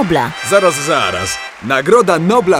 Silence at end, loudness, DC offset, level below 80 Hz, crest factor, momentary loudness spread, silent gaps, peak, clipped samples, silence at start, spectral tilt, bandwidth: 0 s; -13 LUFS; under 0.1%; -46 dBFS; 12 dB; 8 LU; none; 0 dBFS; under 0.1%; 0 s; -4 dB/octave; 16.5 kHz